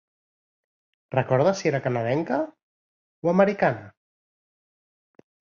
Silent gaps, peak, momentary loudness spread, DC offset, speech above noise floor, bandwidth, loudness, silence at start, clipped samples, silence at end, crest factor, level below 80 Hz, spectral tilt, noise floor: 2.63-3.22 s; -6 dBFS; 8 LU; under 0.1%; over 67 dB; 7.4 kHz; -24 LUFS; 1.1 s; under 0.1%; 1.7 s; 22 dB; -66 dBFS; -7 dB/octave; under -90 dBFS